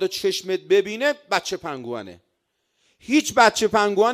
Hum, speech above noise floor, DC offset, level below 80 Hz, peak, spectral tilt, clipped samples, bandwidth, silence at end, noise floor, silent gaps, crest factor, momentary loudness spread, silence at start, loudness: none; 52 dB; under 0.1%; -62 dBFS; -4 dBFS; -3 dB/octave; under 0.1%; 15.5 kHz; 0 s; -73 dBFS; none; 18 dB; 15 LU; 0 s; -21 LUFS